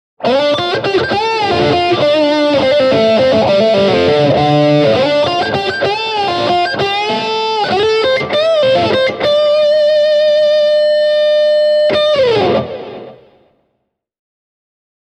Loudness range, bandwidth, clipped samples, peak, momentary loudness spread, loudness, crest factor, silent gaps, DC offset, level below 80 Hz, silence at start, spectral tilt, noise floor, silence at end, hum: 3 LU; 9 kHz; under 0.1%; 0 dBFS; 5 LU; -12 LUFS; 12 dB; none; under 0.1%; -48 dBFS; 0.2 s; -5.5 dB/octave; -69 dBFS; 2.05 s; none